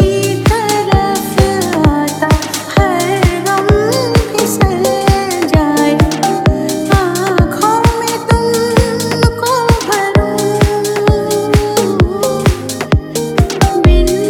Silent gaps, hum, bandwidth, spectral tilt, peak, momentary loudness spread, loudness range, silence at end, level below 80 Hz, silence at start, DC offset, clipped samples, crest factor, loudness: none; none; 19.5 kHz; -5.5 dB/octave; 0 dBFS; 3 LU; 1 LU; 0 s; -20 dBFS; 0 s; under 0.1%; under 0.1%; 12 dB; -12 LUFS